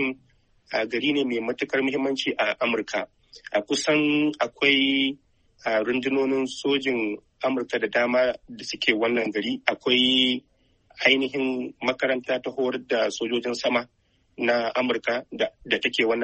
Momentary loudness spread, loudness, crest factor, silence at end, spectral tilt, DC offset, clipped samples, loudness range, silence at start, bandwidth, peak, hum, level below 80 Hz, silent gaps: 9 LU; -24 LUFS; 22 dB; 0 s; -3.5 dB/octave; under 0.1%; under 0.1%; 3 LU; 0 s; 8.4 kHz; -4 dBFS; none; -64 dBFS; none